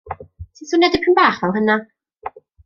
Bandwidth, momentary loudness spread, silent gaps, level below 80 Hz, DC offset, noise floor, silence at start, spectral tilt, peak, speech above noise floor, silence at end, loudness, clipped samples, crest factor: 7.2 kHz; 21 LU; none; -48 dBFS; under 0.1%; -35 dBFS; 0.05 s; -5 dB/octave; -2 dBFS; 20 dB; 0.35 s; -16 LUFS; under 0.1%; 18 dB